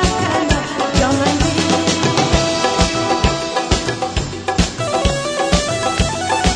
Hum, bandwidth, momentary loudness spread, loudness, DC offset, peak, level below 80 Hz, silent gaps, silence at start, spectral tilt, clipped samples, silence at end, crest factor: none; 10.5 kHz; 4 LU; -16 LUFS; under 0.1%; 0 dBFS; -26 dBFS; none; 0 s; -4 dB/octave; under 0.1%; 0 s; 16 dB